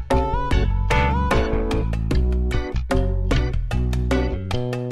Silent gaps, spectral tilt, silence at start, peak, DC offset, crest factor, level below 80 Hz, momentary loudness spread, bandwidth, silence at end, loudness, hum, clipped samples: none; -7 dB/octave; 0 s; -6 dBFS; under 0.1%; 14 dB; -22 dBFS; 5 LU; 12 kHz; 0 s; -22 LUFS; none; under 0.1%